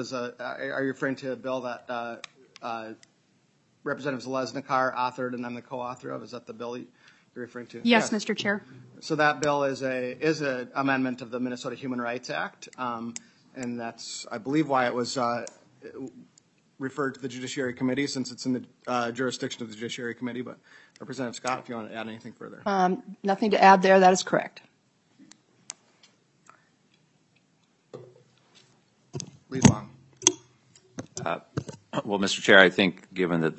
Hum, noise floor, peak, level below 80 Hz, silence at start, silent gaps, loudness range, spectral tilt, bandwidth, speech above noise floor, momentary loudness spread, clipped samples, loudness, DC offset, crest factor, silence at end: none; -67 dBFS; 0 dBFS; -66 dBFS; 0 s; none; 11 LU; -4 dB/octave; 9 kHz; 40 dB; 20 LU; under 0.1%; -27 LUFS; under 0.1%; 28 dB; 0 s